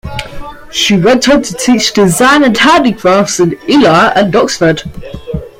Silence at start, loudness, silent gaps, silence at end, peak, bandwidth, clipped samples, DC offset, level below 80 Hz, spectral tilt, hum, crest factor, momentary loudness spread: 0.05 s; -8 LUFS; none; 0.1 s; 0 dBFS; 16.5 kHz; under 0.1%; under 0.1%; -34 dBFS; -4 dB/octave; none; 10 dB; 16 LU